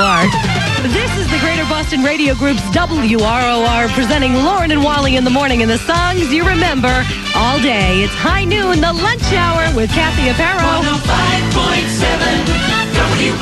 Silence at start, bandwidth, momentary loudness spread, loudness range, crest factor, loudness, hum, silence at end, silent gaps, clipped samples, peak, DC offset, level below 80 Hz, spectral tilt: 0 s; 13.5 kHz; 2 LU; 1 LU; 14 dB; -13 LUFS; none; 0 s; none; under 0.1%; 0 dBFS; under 0.1%; -24 dBFS; -4.5 dB/octave